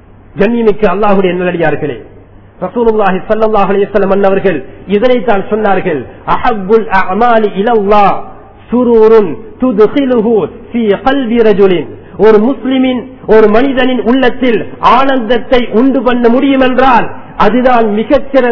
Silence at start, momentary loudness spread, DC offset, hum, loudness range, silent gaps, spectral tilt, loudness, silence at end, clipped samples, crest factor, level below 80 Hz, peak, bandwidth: 0 s; 8 LU; 10%; none; 3 LU; none; -8 dB/octave; -9 LUFS; 0 s; 3%; 10 dB; -32 dBFS; 0 dBFS; 6 kHz